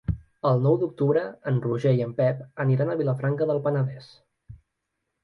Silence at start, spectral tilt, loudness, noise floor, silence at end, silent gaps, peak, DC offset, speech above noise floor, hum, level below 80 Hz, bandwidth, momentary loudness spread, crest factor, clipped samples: 0.1 s; -10 dB/octave; -25 LUFS; -80 dBFS; 0.7 s; none; -10 dBFS; under 0.1%; 56 dB; none; -48 dBFS; 6 kHz; 5 LU; 16 dB; under 0.1%